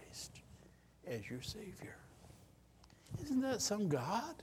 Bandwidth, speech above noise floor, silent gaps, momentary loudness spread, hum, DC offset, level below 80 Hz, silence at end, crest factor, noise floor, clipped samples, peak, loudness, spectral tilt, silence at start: 16.5 kHz; 24 dB; none; 24 LU; none; under 0.1%; -66 dBFS; 0 s; 20 dB; -64 dBFS; under 0.1%; -24 dBFS; -41 LUFS; -4.5 dB/octave; 0 s